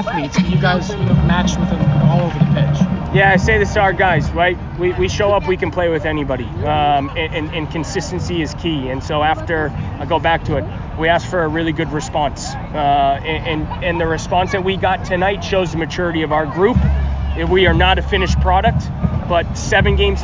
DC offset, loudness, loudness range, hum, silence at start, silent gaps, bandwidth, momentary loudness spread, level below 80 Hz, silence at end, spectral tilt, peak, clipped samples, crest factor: under 0.1%; -16 LUFS; 5 LU; none; 0 s; none; 7.6 kHz; 7 LU; -26 dBFS; 0 s; -6 dB/octave; -2 dBFS; under 0.1%; 14 dB